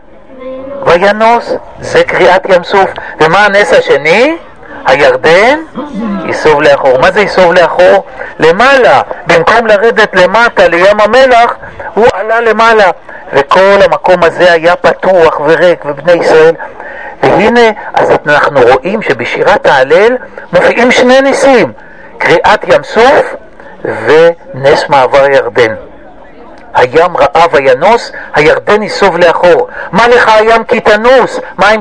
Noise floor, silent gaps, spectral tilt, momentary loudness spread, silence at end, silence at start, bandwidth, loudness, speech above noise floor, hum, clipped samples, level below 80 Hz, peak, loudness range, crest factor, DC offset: -32 dBFS; none; -4.5 dB/octave; 9 LU; 0 s; 0.3 s; 10.5 kHz; -6 LUFS; 26 dB; none; 6%; -36 dBFS; 0 dBFS; 2 LU; 6 dB; 2%